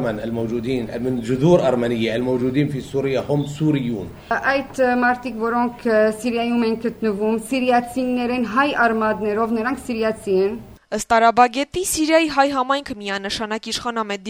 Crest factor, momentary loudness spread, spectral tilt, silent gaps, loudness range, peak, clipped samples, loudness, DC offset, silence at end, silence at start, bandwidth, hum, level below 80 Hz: 18 dB; 8 LU; -5 dB/octave; none; 2 LU; -2 dBFS; under 0.1%; -20 LUFS; under 0.1%; 0 s; 0 s; over 20 kHz; none; -48 dBFS